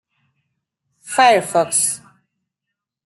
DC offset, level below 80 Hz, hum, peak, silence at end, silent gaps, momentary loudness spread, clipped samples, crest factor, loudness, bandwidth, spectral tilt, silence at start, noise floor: under 0.1%; -72 dBFS; none; -2 dBFS; 1.1 s; none; 10 LU; under 0.1%; 18 dB; -16 LUFS; 12.5 kHz; -1.5 dB/octave; 1.05 s; -82 dBFS